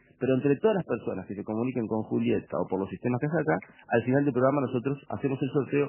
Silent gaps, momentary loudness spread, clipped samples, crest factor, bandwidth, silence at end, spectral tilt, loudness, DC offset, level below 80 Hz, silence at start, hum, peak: none; 7 LU; under 0.1%; 18 dB; 3.2 kHz; 0 s; -11.5 dB/octave; -28 LUFS; under 0.1%; -62 dBFS; 0.2 s; none; -10 dBFS